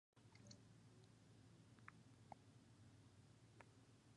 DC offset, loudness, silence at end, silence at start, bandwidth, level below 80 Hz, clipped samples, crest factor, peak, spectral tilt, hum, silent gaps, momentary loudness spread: under 0.1%; -68 LUFS; 0 s; 0.15 s; 11 kHz; -84 dBFS; under 0.1%; 28 dB; -40 dBFS; -5 dB/octave; none; none; 4 LU